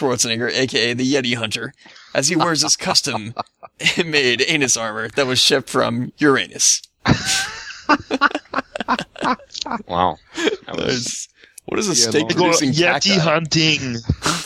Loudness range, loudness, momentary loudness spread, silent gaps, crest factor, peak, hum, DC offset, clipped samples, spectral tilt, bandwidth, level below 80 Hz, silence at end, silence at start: 5 LU; -18 LUFS; 11 LU; none; 18 dB; 0 dBFS; none; under 0.1%; under 0.1%; -2.5 dB/octave; 16 kHz; -46 dBFS; 0 s; 0 s